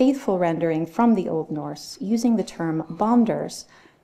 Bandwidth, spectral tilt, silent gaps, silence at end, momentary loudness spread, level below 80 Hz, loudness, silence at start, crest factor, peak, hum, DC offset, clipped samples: 13.5 kHz; -6.5 dB/octave; none; 0.4 s; 12 LU; -60 dBFS; -23 LUFS; 0 s; 16 dB; -6 dBFS; none; under 0.1%; under 0.1%